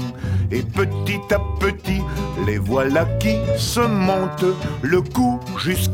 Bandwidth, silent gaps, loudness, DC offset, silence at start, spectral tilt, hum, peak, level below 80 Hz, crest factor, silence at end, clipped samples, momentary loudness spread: 17.5 kHz; none; -20 LUFS; under 0.1%; 0 s; -6 dB/octave; none; -4 dBFS; -34 dBFS; 16 dB; 0 s; under 0.1%; 5 LU